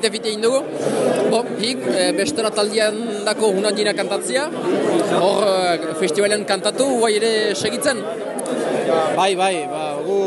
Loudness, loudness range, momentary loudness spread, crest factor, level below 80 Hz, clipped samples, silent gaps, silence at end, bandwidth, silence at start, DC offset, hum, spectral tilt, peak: -19 LUFS; 1 LU; 5 LU; 16 dB; -66 dBFS; under 0.1%; none; 0 s; 12 kHz; 0 s; under 0.1%; none; -3.5 dB/octave; -2 dBFS